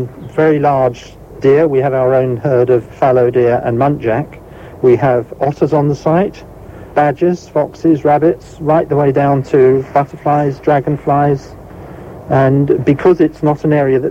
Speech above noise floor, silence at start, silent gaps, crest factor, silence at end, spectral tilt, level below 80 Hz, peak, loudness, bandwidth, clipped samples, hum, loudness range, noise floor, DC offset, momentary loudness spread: 19 dB; 0 s; none; 12 dB; 0 s; -9 dB/octave; -42 dBFS; 0 dBFS; -13 LUFS; 8 kHz; under 0.1%; none; 2 LU; -31 dBFS; under 0.1%; 8 LU